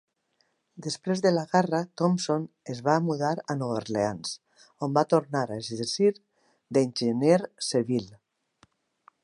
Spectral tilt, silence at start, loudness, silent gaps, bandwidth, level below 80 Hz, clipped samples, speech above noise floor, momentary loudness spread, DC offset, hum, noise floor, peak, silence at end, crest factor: -5.5 dB/octave; 0.75 s; -27 LUFS; none; 11.5 kHz; -70 dBFS; under 0.1%; 46 dB; 11 LU; under 0.1%; none; -73 dBFS; -8 dBFS; 1.1 s; 20 dB